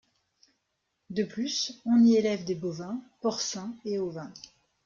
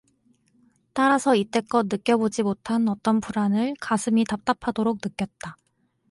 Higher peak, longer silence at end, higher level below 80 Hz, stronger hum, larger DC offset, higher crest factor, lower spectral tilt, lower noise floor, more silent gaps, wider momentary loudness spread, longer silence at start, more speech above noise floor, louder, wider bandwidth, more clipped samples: second, -14 dBFS vs -8 dBFS; second, 0.45 s vs 0.6 s; second, -72 dBFS vs -60 dBFS; neither; neither; about the same, 16 dB vs 18 dB; about the same, -4.5 dB/octave vs -5.5 dB/octave; first, -80 dBFS vs -64 dBFS; neither; first, 16 LU vs 10 LU; first, 1.1 s vs 0.95 s; first, 51 dB vs 41 dB; second, -28 LUFS vs -24 LUFS; second, 7.4 kHz vs 11.5 kHz; neither